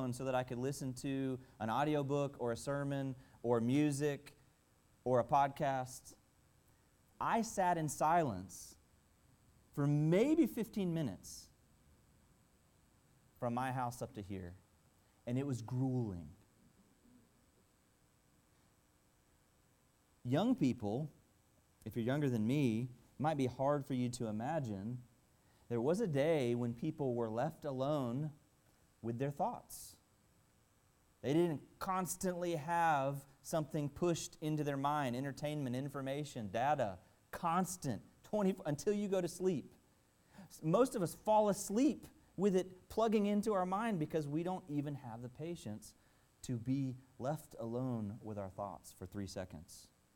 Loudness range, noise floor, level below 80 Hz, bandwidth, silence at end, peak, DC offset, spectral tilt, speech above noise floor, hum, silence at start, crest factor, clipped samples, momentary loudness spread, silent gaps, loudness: 8 LU; -73 dBFS; -70 dBFS; 17.5 kHz; 0.3 s; -20 dBFS; under 0.1%; -6.5 dB/octave; 35 dB; none; 0 s; 18 dB; under 0.1%; 15 LU; none; -38 LUFS